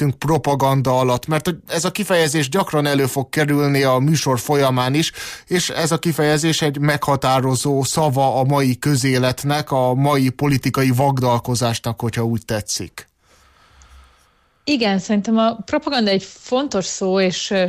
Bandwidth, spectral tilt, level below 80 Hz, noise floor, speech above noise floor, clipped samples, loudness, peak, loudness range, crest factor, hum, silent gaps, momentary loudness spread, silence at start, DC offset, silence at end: 15.5 kHz; -5 dB/octave; -50 dBFS; -58 dBFS; 40 dB; under 0.1%; -18 LUFS; -6 dBFS; 5 LU; 12 dB; none; none; 6 LU; 0 s; under 0.1%; 0 s